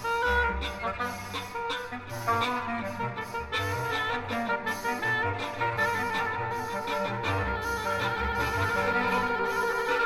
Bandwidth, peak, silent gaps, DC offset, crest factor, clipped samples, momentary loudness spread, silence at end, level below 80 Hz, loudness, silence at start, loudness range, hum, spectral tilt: 16.5 kHz; -14 dBFS; none; under 0.1%; 16 dB; under 0.1%; 7 LU; 0 s; -46 dBFS; -29 LUFS; 0 s; 3 LU; none; -4.5 dB/octave